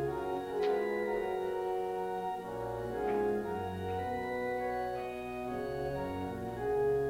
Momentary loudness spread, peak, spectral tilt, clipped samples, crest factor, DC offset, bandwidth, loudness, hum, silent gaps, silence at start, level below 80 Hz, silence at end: 6 LU; -20 dBFS; -7 dB/octave; under 0.1%; 14 dB; under 0.1%; 16 kHz; -36 LUFS; 60 Hz at -65 dBFS; none; 0 s; -56 dBFS; 0 s